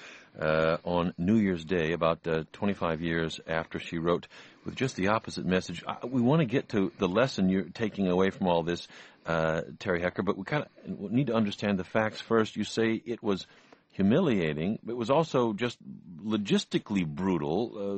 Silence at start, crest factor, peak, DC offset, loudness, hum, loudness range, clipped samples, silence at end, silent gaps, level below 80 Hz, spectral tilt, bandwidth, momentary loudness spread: 0 s; 18 dB; -10 dBFS; under 0.1%; -29 LUFS; none; 3 LU; under 0.1%; 0 s; none; -58 dBFS; -6.5 dB/octave; 8.4 kHz; 9 LU